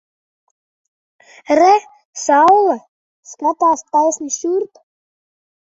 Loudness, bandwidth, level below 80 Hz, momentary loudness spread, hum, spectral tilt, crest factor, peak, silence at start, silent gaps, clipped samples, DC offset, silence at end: -15 LUFS; 8 kHz; -66 dBFS; 12 LU; none; -2.5 dB/octave; 16 dB; -2 dBFS; 1.5 s; 2.05-2.13 s, 2.88-3.23 s; under 0.1%; under 0.1%; 1.1 s